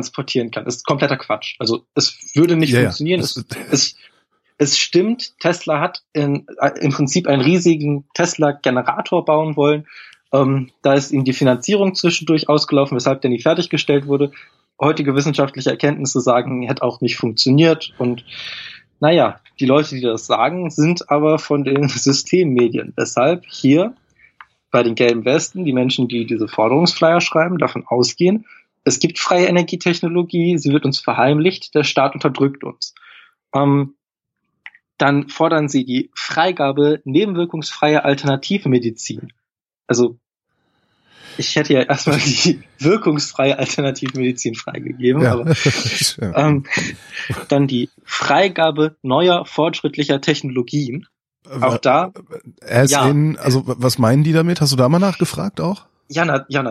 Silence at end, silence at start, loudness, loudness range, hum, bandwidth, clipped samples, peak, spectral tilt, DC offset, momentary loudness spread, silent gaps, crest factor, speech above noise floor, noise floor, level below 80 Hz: 0 s; 0 s; -17 LUFS; 3 LU; none; 14.5 kHz; under 0.1%; -2 dBFS; -5 dB/octave; under 0.1%; 8 LU; none; 16 dB; 61 dB; -77 dBFS; -58 dBFS